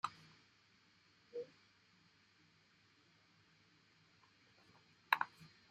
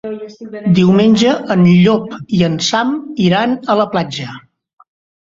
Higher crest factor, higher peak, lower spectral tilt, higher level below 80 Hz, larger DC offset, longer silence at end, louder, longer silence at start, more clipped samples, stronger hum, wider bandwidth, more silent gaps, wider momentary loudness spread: first, 38 dB vs 12 dB; second, -12 dBFS vs -2 dBFS; second, -2.5 dB/octave vs -6 dB/octave; second, under -90 dBFS vs -50 dBFS; neither; second, 0.25 s vs 0.8 s; second, -43 LUFS vs -13 LUFS; about the same, 0.05 s vs 0.05 s; neither; neither; first, 13 kHz vs 7.6 kHz; neither; first, 25 LU vs 15 LU